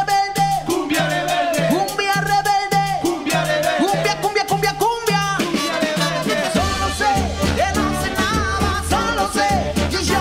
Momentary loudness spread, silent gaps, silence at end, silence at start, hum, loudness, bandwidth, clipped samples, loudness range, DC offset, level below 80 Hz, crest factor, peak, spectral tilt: 2 LU; none; 0 s; 0 s; none; -19 LUFS; 16 kHz; under 0.1%; 1 LU; under 0.1%; -36 dBFS; 14 dB; -4 dBFS; -4 dB/octave